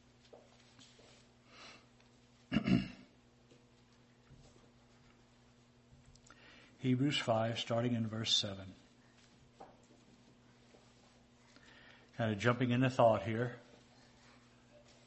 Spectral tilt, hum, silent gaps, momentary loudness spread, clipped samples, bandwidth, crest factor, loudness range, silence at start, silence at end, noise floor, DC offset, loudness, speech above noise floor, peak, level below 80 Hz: -5.5 dB/octave; 60 Hz at -65 dBFS; none; 28 LU; under 0.1%; 8.2 kHz; 24 dB; 7 LU; 0.35 s; 1.45 s; -66 dBFS; under 0.1%; -35 LUFS; 32 dB; -16 dBFS; -66 dBFS